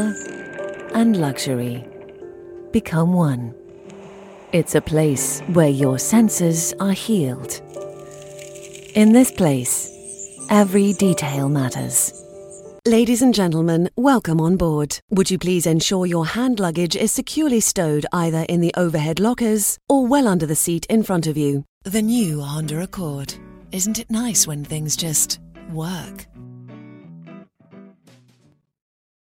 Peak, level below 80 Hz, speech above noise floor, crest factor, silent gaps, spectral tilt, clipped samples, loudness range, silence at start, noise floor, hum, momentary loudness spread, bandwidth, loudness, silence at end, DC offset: 0 dBFS; -48 dBFS; 40 dB; 20 dB; 15.02-15.08 s, 21.69-21.81 s; -5 dB/octave; under 0.1%; 5 LU; 0 s; -59 dBFS; none; 19 LU; 17.5 kHz; -19 LUFS; 1.35 s; under 0.1%